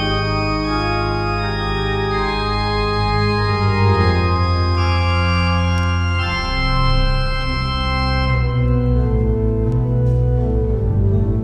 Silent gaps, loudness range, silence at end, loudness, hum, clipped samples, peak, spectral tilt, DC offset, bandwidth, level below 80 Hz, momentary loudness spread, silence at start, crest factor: none; 2 LU; 0 s; -18 LUFS; none; under 0.1%; -4 dBFS; -7 dB/octave; under 0.1%; 8.8 kHz; -22 dBFS; 4 LU; 0 s; 12 dB